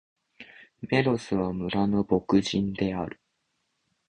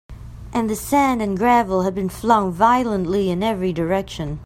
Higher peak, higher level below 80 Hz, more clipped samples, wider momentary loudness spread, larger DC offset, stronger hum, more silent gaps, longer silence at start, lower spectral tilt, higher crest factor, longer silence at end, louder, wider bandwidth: second, -8 dBFS vs -2 dBFS; second, -54 dBFS vs -40 dBFS; neither; first, 16 LU vs 8 LU; neither; neither; neither; first, 0.4 s vs 0.1 s; about the same, -6.5 dB/octave vs -6 dB/octave; about the same, 20 dB vs 18 dB; first, 0.95 s vs 0 s; second, -26 LUFS vs -19 LUFS; second, 9.4 kHz vs 16 kHz